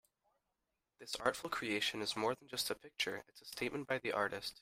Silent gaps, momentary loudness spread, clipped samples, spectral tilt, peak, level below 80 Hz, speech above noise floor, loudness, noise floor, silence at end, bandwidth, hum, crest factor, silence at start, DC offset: none; 8 LU; under 0.1%; -2.5 dB/octave; -18 dBFS; -74 dBFS; 48 dB; -39 LUFS; -88 dBFS; 0.1 s; 16 kHz; none; 24 dB; 1 s; under 0.1%